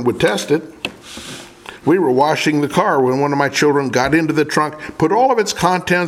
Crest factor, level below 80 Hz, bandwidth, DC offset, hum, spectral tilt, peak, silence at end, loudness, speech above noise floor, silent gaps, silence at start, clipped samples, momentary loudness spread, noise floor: 16 dB; -48 dBFS; 16 kHz; under 0.1%; none; -5 dB/octave; 0 dBFS; 0 s; -16 LUFS; 20 dB; none; 0 s; under 0.1%; 15 LU; -36 dBFS